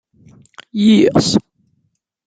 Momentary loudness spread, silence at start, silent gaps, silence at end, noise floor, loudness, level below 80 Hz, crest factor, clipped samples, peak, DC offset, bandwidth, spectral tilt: 9 LU; 0.75 s; none; 0.85 s; -67 dBFS; -13 LUFS; -50 dBFS; 16 dB; under 0.1%; -2 dBFS; under 0.1%; 9.4 kHz; -5.5 dB/octave